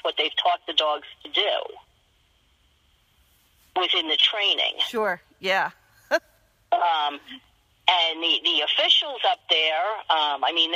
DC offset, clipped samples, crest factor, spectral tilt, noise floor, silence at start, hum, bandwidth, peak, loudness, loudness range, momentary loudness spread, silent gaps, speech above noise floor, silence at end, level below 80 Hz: under 0.1%; under 0.1%; 22 dB; -1.5 dB/octave; -63 dBFS; 0.05 s; none; 15.5 kHz; -2 dBFS; -22 LUFS; 6 LU; 9 LU; none; 40 dB; 0 s; -70 dBFS